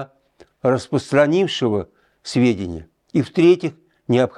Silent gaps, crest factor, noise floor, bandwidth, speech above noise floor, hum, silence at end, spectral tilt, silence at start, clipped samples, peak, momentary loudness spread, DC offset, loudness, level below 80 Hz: none; 16 dB; -53 dBFS; 10.5 kHz; 36 dB; none; 0.1 s; -6.5 dB/octave; 0 s; under 0.1%; -4 dBFS; 20 LU; under 0.1%; -19 LUFS; -54 dBFS